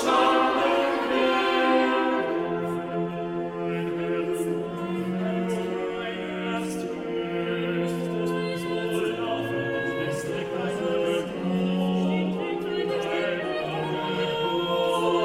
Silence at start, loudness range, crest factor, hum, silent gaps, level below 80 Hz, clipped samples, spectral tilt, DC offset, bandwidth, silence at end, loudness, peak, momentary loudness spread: 0 s; 4 LU; 16 dB; none; none; -60 dBFS; under 0.1%; -6 dB/octave; under 0.1%; 15.5 kHz; 0 s; -26 LUFS; -10 dBFS; 8 LU